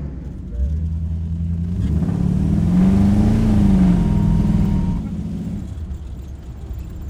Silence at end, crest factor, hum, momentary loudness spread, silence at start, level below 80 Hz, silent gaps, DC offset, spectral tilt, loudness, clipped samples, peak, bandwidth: 0 s; 14 dB; none; 17 LU; 0 s; -26 dBFS; none; under 0.1%; -9.5 dB/octave; -18 LUFS; under 0.1%; -4 dBFS; 9.8 kHz